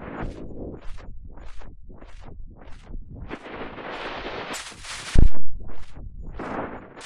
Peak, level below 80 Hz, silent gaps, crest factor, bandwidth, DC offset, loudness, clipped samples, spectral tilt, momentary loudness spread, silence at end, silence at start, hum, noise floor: -6 dBFS; -30 dBFS; none; 14 dB; 11 kHz; under 0.1%; -32 LUFS; under 0.1%; -5 dB/octave; 20 LU; 0 s; 0 s; none; -40 dBFS